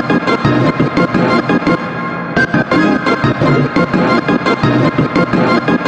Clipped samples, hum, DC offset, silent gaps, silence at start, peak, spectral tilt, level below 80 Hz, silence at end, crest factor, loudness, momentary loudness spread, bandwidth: under 0.1%; none; under 0.1%; none; 0 s; 0 dBFS; -7 dB/octave; -38 dBFS; 0 s; 12 dB; -13 LUFS; 2 LU; 9.2 kHz